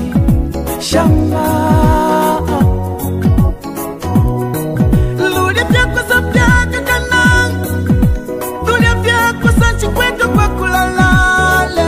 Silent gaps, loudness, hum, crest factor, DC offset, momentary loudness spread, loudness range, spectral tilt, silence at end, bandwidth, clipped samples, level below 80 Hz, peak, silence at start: none; -12 LUFS; none; 12 dB; 0.4%; 7 LU; 2 LU; -5.5 dB/octave; 0 s; 15.5 kHz; under 0.1%; -20 dBFS; 0 dBFS; 0 s